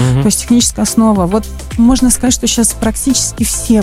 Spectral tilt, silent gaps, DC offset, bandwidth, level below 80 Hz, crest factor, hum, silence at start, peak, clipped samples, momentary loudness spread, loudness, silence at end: -4.5 dB/octave; none; under 0.1%; 16 kHz; -26 dBFS; 12 dB; none; 0 s; 0 dBFS; under 0.1%; 5 LU; -11 LUFS; 0 s